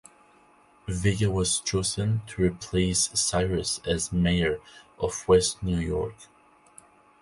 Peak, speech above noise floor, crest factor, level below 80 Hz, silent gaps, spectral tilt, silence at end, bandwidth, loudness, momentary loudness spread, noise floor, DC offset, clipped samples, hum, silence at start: -8 dBFS; 32 dB; 20 dB; -42 dBFS; none; -4.5 dB/octave; 0.95 s; 11.5 kHz; -26 LUFS; 9 LU; -58 dBFS; under 0.1%; under 0.1%; none; 0.85 s